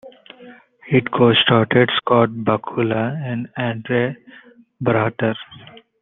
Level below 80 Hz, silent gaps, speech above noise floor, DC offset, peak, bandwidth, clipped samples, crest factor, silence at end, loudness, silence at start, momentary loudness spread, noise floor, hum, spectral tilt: -60 dBFS; none; 26 dB; under 0.1%; -2 dBFS; 4.1 kHz; under 0.1%; 18 dB; 0.3 s; -18 LUFS; 0.05 s; 11 LU; -44 dBFS; none; -9.5 dB/octave